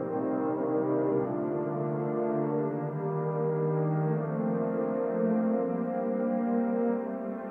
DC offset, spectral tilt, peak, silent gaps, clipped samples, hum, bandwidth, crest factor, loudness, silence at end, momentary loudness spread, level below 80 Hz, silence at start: under 0.1%; -12.5 dB/octave; -16 dBFS; none; under 0.1%; none; 3 kHz; 12 dB; -30 LUFS; 0 s; 4 LU; -74 dBFS; 0 s